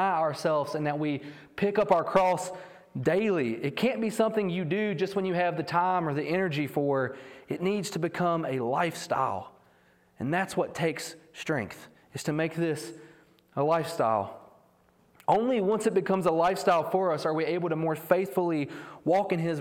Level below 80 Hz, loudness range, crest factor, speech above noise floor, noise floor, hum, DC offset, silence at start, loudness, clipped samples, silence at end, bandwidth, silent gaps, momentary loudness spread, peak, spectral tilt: -68 dBFS; 5 LU; 20 dB; 36 dB; -64 dBFS; none; under 0.1%; 0 s; -28 LUFS; under 0.1%; 0 s; 17.5 kHz; none; 12 LU; -8 dBFS; -6 dB/octave